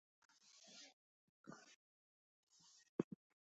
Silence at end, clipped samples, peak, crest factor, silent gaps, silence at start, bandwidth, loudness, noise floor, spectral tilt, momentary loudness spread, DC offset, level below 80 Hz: 0.35 s; under 0.1%; -24 dBFS; 32 dB; 0.93-1.44 s, 1.76-2.47 s, 2.89-3.11 s; 0.45 s; 8 kHz; -54 LUFS; under -90 dBFS; -6 dB/octave; 20 LU; under 0.1%; under -90 dBFS